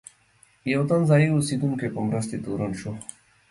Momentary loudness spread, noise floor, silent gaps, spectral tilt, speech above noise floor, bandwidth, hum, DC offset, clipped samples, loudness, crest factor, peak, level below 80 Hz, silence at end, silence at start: 15 LU; -60 dBFS; none; -6.5 dB/octave; 36 dB; 11.5 kHz; none; under 0.1%; under 0.1%; -24 LUFS; 18 dB; -8 dBFS; -56 dBFS; 0.45 s; 0.65 s